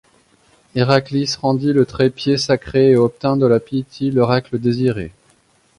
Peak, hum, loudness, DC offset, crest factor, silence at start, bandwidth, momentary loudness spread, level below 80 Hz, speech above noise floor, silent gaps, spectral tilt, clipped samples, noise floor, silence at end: 0 dBFS; none; -17 LUFS; under 0.1%; 16 dB; 0.75 s; 11 kHz; 7 LU; -48 dBFS; 40 dB; none; -6.5 dB/octave; under 0.1%; -56 dBFS; 0.7 s